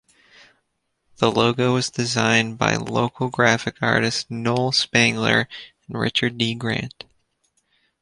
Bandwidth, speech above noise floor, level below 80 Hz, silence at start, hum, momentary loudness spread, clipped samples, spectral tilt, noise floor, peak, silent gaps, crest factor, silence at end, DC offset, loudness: 11.5 kHz; 52 dB; -54 dBFS; 1.2 s; none; 8 LU; under 0.1%; -4 dB/octave; -73 dBFS; -2 dBFS; none; 20 dB; 1.1 s; under 0.1%; -20 LUFS